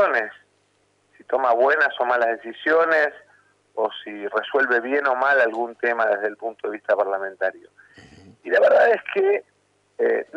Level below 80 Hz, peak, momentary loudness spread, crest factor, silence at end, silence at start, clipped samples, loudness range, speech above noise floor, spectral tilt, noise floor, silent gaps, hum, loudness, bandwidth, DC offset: -74 dBFS; -8 dBFS; 10 LU; 14 dB; 0 s; 0 s; under 0.1%; 1 LU; 44 dB; -4.5 dB/octave; -65 dBFS; none; 50 Hz at -70 dBFS; -21 LUFS; 8 kHz; under 0.1%